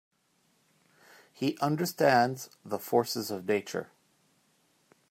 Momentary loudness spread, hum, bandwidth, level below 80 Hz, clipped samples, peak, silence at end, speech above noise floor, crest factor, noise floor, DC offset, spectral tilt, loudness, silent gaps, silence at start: 14 LU; none; 16 kHz; -78 dBFS; under 0.1%; -10 dBFS; 1.25 s; 42 dB; 22 dB; -71 dBFS; under 0.1%; -5 dB/octave; -29 LUFS; none; 1.4 s